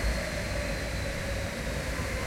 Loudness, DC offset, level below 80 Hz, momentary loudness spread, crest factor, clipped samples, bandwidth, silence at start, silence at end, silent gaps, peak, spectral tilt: -33 LUFS; under 0.1%; -36 dBFS; 1 LU; 12 dB; under 0.1%; 16.5 kHz; 0 s; 0 s; none; -18 dBFS; -4.5 dB/octave